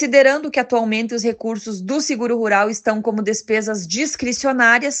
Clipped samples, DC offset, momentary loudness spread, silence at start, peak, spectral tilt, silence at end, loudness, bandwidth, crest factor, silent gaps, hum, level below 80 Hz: under 0.1%; under 0.1%; 9 LU; 0 s; -2 dBFS; -3 dB/octave; 0 s; -18 LUFS; 9 kHz; 16 dB; none; none; -60 dBFS